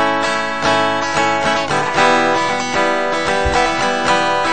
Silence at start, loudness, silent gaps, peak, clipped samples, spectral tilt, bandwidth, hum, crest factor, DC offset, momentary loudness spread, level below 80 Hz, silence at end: 0 s; -15 LUFS; none; 0 dBFS; under 0.1%; -3.5 dB/octave; 9.2 kHz; none; 16 dB; 2%; 4 LU; -36 dBFS; 0 s